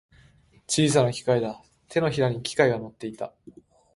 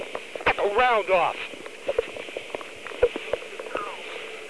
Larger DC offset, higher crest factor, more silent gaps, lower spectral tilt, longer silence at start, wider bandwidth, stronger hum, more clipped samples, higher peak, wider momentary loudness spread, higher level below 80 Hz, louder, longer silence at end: second, under 0.1% vs 0.4%; about the same, 22 dB vs 20 dB; neither; first, -5 dB/octave vs -3.5 dB/octave; first, 0.7 s vs 0 s; about the same, 11.5 kHz vs 11 kHz; neither; neither; about the same, -4 dBFS vs -6 dBFS; about the same, 16 LU vs 14 LU; second, -60 dBFS vs -52 dBFS; about the same, -25 LUFS vs -26 LUFS; first, 0.45 s vs 0 s